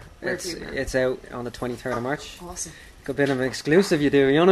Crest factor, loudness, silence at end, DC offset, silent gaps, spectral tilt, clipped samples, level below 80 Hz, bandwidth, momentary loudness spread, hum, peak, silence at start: 20 dB; -24 LUFS; 0 s; under 0.1%; none; -5 dB/octave; under 0.1%; -46 dBFS; 13.5 kHz; 14 LU; none; -4 dBFS; 0 s